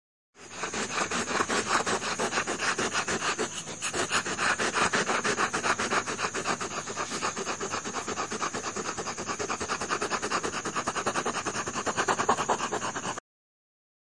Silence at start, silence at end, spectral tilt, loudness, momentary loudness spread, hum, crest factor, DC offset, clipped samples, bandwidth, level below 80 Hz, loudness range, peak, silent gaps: 0.35 s; 0.95 s; -2 dB/octave; -29 LUFS; 7 LU; none; 20 dB; 0.2%; under 0.1%; 11.5 kHz; -60 dBFS; 4 LU; -12 dBFS; none